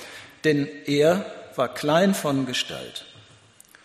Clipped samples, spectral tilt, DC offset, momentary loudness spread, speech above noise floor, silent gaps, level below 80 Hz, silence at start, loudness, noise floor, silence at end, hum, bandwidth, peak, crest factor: under 0.1%; -5 dB/octave; under 0.1%; 15 LU; 30 dB; none; -64 dBFS; 0 s; -23 LUFS; -53 dBFS; 0.8 s; none; 13.5 kHz; -6 dBFS; 18 dB